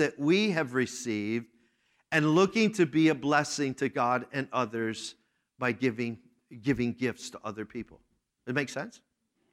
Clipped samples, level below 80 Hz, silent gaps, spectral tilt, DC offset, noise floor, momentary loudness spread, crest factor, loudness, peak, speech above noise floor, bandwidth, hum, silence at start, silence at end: under 0.1%; -66 dBFS; none; -5 dB/octave; under 0.1%; -71 dBFS; 15 LU; 20 dB; -29 LUFS; -10 dBFS; 42 dB; 13 kHz; none; 0 s; 0.55 s